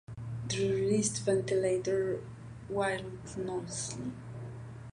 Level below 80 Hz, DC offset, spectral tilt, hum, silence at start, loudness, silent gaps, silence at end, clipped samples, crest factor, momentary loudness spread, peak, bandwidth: -58 dBFS; under 0.1%; -5 dB/octave; none; 0.1 s; -33 LUFS; none; 0 s; under 0.1%; 16 dB; 15 LU; -18 dBFS; 11 kHz